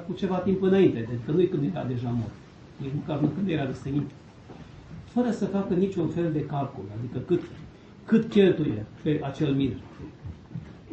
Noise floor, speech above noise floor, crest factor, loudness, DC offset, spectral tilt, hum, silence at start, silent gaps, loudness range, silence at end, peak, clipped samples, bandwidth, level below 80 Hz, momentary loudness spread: -46 dBFS; 20 dB; 18 dB; -27 LUFS; under 0.1%; -8.5 dB/octave; none; 0 s; none; 4 LU; 0 s; -8 dBFS; under 0.1%; 8.2 kHz; -54 dBFS; 22 LU